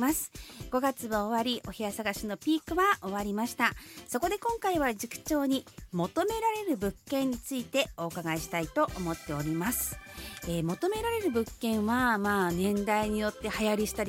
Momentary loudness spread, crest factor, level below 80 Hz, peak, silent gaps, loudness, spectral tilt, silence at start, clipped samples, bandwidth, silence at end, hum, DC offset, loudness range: 8 LU; 20 dB; -52 dBFS; -10 dBFS; none; -31 LUFS; -4.5 dB/octave; 0 s; under 0.1%; 17 kHz; 0 s; none; under 0.1%; 3 LU